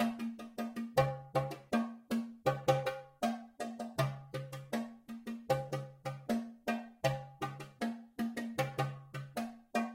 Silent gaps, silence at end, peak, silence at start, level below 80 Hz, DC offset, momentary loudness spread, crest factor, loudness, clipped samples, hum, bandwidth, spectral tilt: none; 0 s; -14 dBFS; 0 s; -66 dBFS; under 0.1%; 11 LU; 22 dB; -38 LUFS; under 0.1%; none; 16.5 kHz; -6 dB/octave